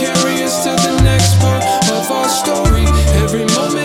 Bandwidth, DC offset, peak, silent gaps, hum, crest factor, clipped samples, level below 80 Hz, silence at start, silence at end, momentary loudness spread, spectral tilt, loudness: 17 kHz; under 0.1%; 0 dBFS; none; none; 12 dB; under 0.1%; -20 dBFS; 0 s; 0 s; 3 LU; -4.5 dB/octave; -13 LUFS